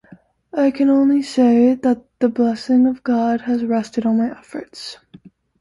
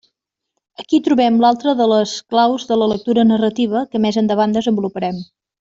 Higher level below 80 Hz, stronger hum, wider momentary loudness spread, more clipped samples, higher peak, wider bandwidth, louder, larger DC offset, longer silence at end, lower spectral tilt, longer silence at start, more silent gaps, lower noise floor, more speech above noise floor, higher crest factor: about the same, -60 dBFS vs -56 dBFS; neither; first, 17 LU vs 7 LU; neither; about the same, -4 dBFS vs -2 dBFS; first, 11.5 kHz vs 7.8 kHz; about the same, -17 LUFS vs -16 LUFS; neither; about the same, 0.35 s vs 0.35 s; about the same, -6 dB/octave vs -6 dB/octave; second, 0.55 s vs 0.8 s; neither; second, -48 dBFS vs -76 dBFS; second, 31 dB vs 61 dB; about the same, 14 dB vs 14 dB